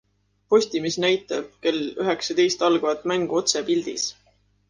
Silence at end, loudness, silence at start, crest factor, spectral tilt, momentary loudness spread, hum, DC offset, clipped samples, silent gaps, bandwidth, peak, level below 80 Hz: 0.55 s; -23 LUFS; 0.5 s; 18 dB; -3 dB/octave; 6 LU; 50 Hz at -55 dBFS; under 0.1%; under 0.1%; none; 10 kHz; -6 dBFS; -66 dBFS